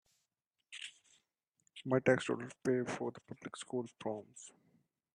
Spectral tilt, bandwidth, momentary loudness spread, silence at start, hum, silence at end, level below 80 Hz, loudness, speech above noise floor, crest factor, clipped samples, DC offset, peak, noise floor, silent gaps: -5.5 dB/octave; 11 kHz; 21 LU; 0.7 s; none; 0.65 s; -80 dBFS; -38 LUFS; 51 dB; 24 dB; under 0.1%; under 0.1%; -16 dBFS; -88 dBFS; none